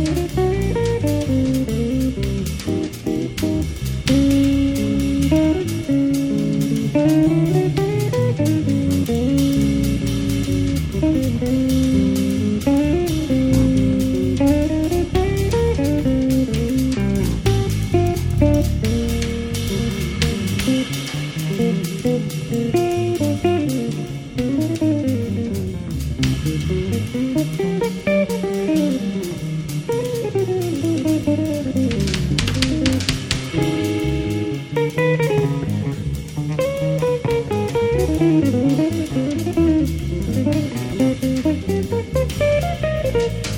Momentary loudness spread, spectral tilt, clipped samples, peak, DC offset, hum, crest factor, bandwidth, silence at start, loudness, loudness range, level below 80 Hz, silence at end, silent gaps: 6 LU; -6.5 dB/octave; under 0.1%; 0 dBFS; under 0.1%; none; 18 dB; 17.5 kHz; 0 s; -19 LUFS; 3 LU; -30 dBFS; 0 s; none